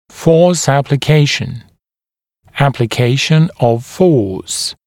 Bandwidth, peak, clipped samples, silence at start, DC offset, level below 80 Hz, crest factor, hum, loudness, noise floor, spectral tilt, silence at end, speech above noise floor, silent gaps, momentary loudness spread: 16 kHz; 0 dBFS; under 0.1%; 0.15 s; under 0.1%; -44 dBFS; 14 dB; none; -13 LUFS; under -90 dBFS; -5.5 dB/octave; 0.15 s; over 78 dB; none; 8 LU